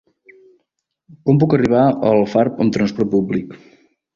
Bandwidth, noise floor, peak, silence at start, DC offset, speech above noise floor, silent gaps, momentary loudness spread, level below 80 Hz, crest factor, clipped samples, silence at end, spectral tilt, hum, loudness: 7.4 kHz; -73 dBFS; -2 dBFS; 1.1 s; under 0.1%; 57 dB; none; 9 LU; -52 dBFS; 16 dB; under 0.1%; 0.6 s; -8.5 dB/octave; none; -16 LUFS